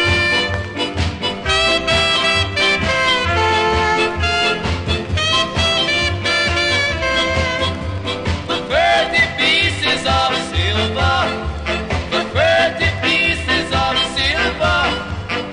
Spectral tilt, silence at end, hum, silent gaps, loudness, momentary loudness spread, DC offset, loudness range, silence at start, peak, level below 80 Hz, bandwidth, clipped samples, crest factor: -4 dB/octave; 0 s; none; none; -16 LUFS; 7 LU; under 0.1%; 2 LU; 0 s; -2 dBFS; -28 dBFS; 10.5 kHz; under 0.1%; 14 dB